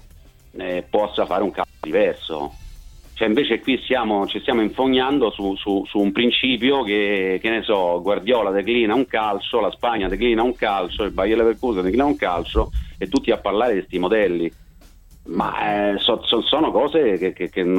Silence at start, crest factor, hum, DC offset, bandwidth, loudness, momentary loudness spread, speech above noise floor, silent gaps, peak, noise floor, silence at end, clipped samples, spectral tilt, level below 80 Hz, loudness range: 0.55 s; 16 dB; none; under 0.1%; 16.5 kHz; -20 LUFS; 7 LU; 27 dB; none; -4 dBFS; -47 dBFS; 0 s; under 0.1%; -6 dB/octave; -38 dBFS; 3 LU